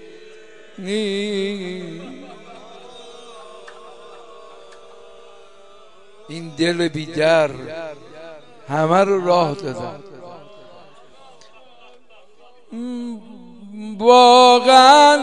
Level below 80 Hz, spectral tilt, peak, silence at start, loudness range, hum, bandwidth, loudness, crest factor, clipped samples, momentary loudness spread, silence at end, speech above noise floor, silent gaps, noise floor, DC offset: -64 dBFS; -4 dB/octave; 0 dBFS; 0.8 s; 24 LU; none; 12 kHz; -15 LUFS; 18 dB; under 0.1%; 30 LU; 0 s; 36 dB; none; -51 dBFS; 0.6%